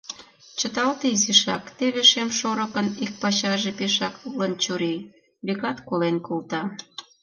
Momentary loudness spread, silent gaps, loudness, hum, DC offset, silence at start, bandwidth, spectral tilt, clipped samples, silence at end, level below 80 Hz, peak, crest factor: 16 LU; none; -23 LUFS; none; under 0.1%; 0.1 s; 10.5 kHz; -2.5 dB/octave; under 0.1%; 0.2 s; -68 dBFS; -2 dBFS; 22 dB